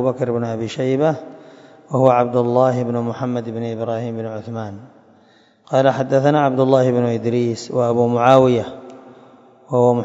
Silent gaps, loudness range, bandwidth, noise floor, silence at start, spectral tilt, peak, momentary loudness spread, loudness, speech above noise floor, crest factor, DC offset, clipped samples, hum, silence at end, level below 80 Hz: none; 6 LU; 7.8 kHz; -53 dBFS; 0 s; -7.5 dB/octave; 0 dBFS; 13 LU; -18 LUFS; 36 dB; 18 dB; under 0.1%; under 0.1%; none; 0 s; -60 dBFS